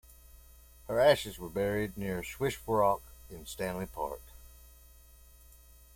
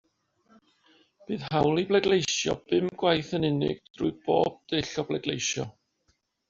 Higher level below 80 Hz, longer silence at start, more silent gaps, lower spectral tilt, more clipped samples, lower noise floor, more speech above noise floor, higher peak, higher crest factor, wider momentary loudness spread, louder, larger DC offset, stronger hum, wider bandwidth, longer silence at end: first, -54 dBFS vs -60 dBFS; second, 0.35 s vs 1.3 s; second, none vs 3.90-3.94 s; about the same, -5 dB/octave vs -4 dB/octave; neither; second, -56 dBFS vs -72 dBFS; second, 25 dB vs 46 dB; second, -12 dBFS vs -8 dBFS; about the same, 22 dB vs 20 dB; first, 20 LU vs 8 LU; second, -32 LUFS vs -27 LUFS; neither; neither; first, 16.5 kHz vs 7.6 kHz; first, 1.3 s vs 0.8 s